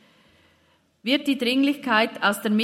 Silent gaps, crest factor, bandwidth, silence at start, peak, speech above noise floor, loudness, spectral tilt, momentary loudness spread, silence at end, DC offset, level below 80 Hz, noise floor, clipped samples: none; 20 dB; 16 kHz; 1.05 s; -4 dBFS; 41 dB; -22 LUFS; -4 dB/octave; 4 LU; 0 s; under 0.1%; -72 dBFS; -63 dBFS; under 0.1%